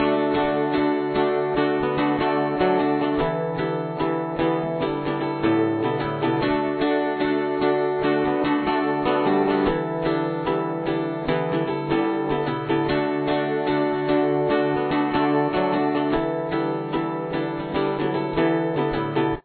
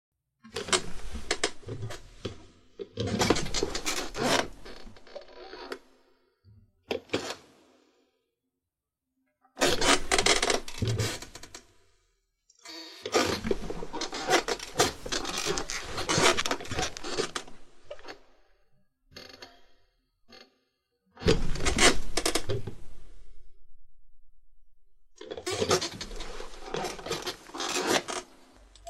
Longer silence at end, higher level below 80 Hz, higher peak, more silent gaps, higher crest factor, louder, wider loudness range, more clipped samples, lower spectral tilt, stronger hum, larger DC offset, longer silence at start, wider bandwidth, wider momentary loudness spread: about the same, 0.05 s vs 0 s; about the same, -48 dBFS vs -44 dBFS; about the same, -8 dBFS vs -6 dBFS; neither; second, 14 dB vs 26 dB; first, -23 LUFS vs -29 LUFS; second, 2 LU vs 13 LU; neither; first, -10.5 dB/octave vs -2.5 dB/octave; neither; neither; second, 0 s vs 0.45 s; second, 4.5 kHz vs 15.5 kHz; second, 4 LU vs 23 LU